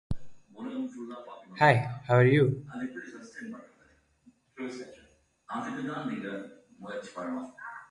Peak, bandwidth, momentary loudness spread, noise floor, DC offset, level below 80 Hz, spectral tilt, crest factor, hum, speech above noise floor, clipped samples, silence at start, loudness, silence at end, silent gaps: -8 dBFS; 11.5 kHz; 21 LU; -65 dBFS; under 0.1%; -58 dBFS; -7.5 dB/octave; 24 dB; none; 36 dB; under 0.1%; 0.1 s; -29 LUFS; 0.05 s; none